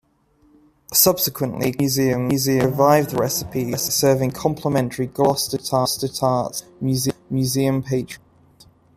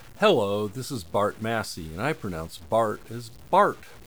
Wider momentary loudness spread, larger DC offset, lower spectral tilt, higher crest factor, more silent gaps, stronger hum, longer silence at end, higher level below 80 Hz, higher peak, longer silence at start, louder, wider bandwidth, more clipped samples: second, 8 LU vs 13 LU; second, under 0.1% vs 0.4%; about the same, -4.5 dB/octave vs -5 dB/octave; about the same, 20 dB vs 20 dB; neither; neither; first, 0.8 s vs 0 s; about the same, -52 dBFS vs -56 dBFS; first, 0 dBFS vs -6 dBFS; first, 0.9 s vs 0 s; first, -20 LUFS vs -26 LUFS; second, 15.5 kHz vs over 20 kHz; neither